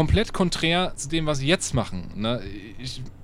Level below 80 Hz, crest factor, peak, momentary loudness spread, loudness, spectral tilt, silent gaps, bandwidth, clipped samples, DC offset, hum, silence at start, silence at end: -34 dBFS; 18 dB; -6 dBFS; 13 LU; -25 LUFS; -4.5 dB/octave; none; 14.5 kHz; under 0.1%; under 0.1%; none; 0 s; 0 s